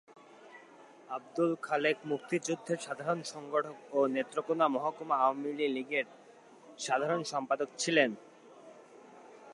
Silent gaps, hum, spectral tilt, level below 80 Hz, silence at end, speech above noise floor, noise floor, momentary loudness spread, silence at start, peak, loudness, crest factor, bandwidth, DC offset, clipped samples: none; none; -4 dB/octave; -88 dBFS; 0 s; 24 dB; -56 dBFS; 14 LU; 0.1 s; -12 dBFS; -33 LUFS; 22 dB; 11.5 kHz; under 0.1%; under 0.1%